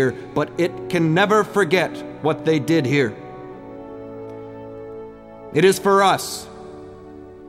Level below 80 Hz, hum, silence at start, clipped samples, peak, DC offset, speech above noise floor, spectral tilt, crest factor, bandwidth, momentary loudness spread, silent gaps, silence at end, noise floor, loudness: -56 dBFS; none; 0 s; under 0.1%; -4 dBFS; under 0.1%; 21 dB; -5.5 dB/octave; 18 dB; 16 kHz; 22 LU; none; 0 s; -39 dBFS; -19 LUFS